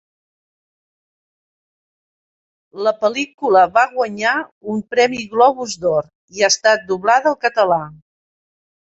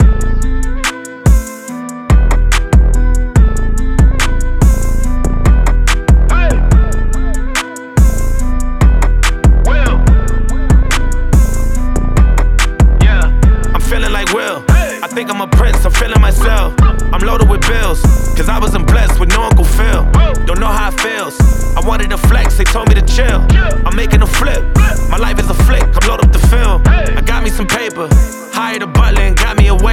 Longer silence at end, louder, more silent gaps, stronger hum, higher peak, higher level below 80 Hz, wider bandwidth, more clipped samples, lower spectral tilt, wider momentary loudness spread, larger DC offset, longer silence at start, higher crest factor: first, 0.9 s vs 0 s; second, -17 LUFS vs -12 LUFS; first, 3.34-3.38 s, 4.52-4.61 s, 6.15-6.28 s vs none; neither; about the same, -2 dBFS vs 0 dBFS; second, -62 dBFS vs -10 dBFS; second, 8 kHz vs 15.5 kHz; neither; second, -2.5 dB/octave vs -5.5 dB/octave; about the same, 8 LU vs 6 LU; neither; first, 2.75 s vs 0 s; first, 18 dB vs 8 dB